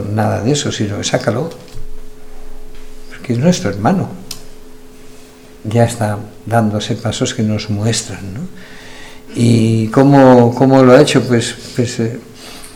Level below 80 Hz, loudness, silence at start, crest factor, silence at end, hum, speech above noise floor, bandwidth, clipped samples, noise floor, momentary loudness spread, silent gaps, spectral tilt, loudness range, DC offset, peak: -34 dBFS; -13 LUFS; 0 s; 14 dB; 0 s; none; 24 dB; 15.5 kHz; 0.8%; -36 dBFS; 23 LU; none; -6 dB/octave; 9 LU; under 0.1%; 0 dBFS